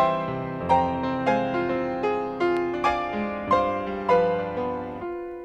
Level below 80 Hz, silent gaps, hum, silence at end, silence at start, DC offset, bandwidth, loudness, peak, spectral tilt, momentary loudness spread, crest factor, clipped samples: -50 dBFS; none; none; 0 s; 0 s; under 0.1%; 9 kHz; -25 LUFS; -8 dBFS; -7 dB/octave; 8 LU; 18 dB; under 0.1%